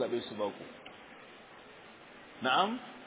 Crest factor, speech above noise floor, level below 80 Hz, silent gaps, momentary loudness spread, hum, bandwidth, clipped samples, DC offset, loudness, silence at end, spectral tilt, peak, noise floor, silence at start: 22 dB; 19 dB; -76 dBFS; none; 23 LU; none; 4 kHz; under 0.1%; under 0.1%; -33 LUFS; 0 s; -1.5 dB/octave; -16 dBFS; -54 dBFS; 0 s